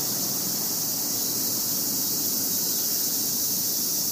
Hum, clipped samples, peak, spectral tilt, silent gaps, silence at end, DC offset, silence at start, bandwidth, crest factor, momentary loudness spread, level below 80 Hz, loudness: none; under 0.1%; -12 dBFS; -1 dB/octave; none; 0 s; under 0.1%; 0 s; 15.5 kHz; 14 dB; 2 LU; -68 dBFS; -23 LUFS